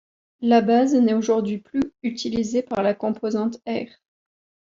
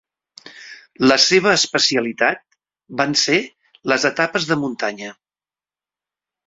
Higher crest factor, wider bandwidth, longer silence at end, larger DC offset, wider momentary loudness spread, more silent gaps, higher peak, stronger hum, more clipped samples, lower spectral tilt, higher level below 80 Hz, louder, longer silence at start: about the same, 18 dB vs 20 dB; about the same, 7.6 kHz vs 8 kHz; second, 0.85 s vs 1.35 s; neither; second, 11 LU vs 21 LU; neither; second, -6 dBFS vs 0 dBFS; neither; neither; first, -6 dB/octave vs -2.5 dB/octave; about the same, -60 dBFS vs -62 dBFS; second, -22 LUFS vs -17 LUFS; about the same, 0.4 s vs 0.45 s